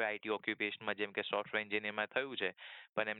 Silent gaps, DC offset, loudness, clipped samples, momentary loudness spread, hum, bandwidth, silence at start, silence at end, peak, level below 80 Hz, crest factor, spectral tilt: 2.89-2.93 s; under 0.1%; -38 LUFS; under 0.1%; 4 LU; none; 4.5 kHz; 0 s; 0 s; -18 dBFS; -84 dBFS; 20 dB; -6.5 dB/octave